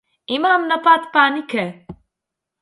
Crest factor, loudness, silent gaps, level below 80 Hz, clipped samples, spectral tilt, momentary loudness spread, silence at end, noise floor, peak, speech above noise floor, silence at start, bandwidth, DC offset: 18 dB; -17 LUFS; none; -60 dBFS; under 0.1%; -5 dB/octave; 11 LU; 0.7 s; -83 dBFS; 0 dBFS; 66 dB; 0.3 s; 11.5 kHz; under 0.1%